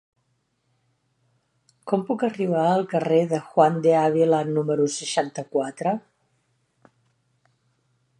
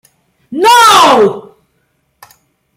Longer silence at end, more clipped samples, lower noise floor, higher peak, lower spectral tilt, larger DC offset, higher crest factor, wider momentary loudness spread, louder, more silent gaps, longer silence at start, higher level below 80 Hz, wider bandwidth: first, 2.2 s vs 1.35 s; second, under 0.1% vs 0.1%; first, -71 dBFS vs -60 dBFS; second, -4 dBFS vs 0 dBFS; first, -6 dB/octave vs -2 dB/octave; neither; first, 20 dB vs 10 dB; second, 8 LU vs 19 LU; second, -22 LUFS vs -6 LUFS; neither; first, 1.85 s vs 0.5 s; second, -74 dBFS vs -54 dBFS; second, 11 kHz vs 16.5 kHz